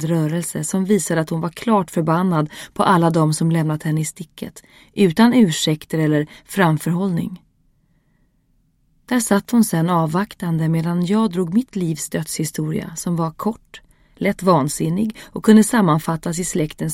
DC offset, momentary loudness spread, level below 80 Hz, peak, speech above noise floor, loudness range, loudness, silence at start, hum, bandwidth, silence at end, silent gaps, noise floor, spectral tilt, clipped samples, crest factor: under 0.1%; 10 LU; -52 dBFS; 0 dBFS; 43 dB; 4 LU; -19 LUFS; 0 s; none; 16.5 kHz; 0 s; none; -61 dBFS; -5.5 dB/octave; under 0.1%; 18 dB